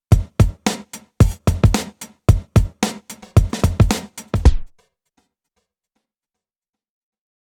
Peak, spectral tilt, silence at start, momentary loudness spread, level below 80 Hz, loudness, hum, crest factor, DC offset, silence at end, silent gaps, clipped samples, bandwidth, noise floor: 0 dBFS; -6 dB/octave; 0.1 s; 12 LU; -24 dBFS; -19 LUFS; none; 18 dB; under 0.1%; 2.9 s; none; under 0.1%; 17.5 kHz; -89 dBFS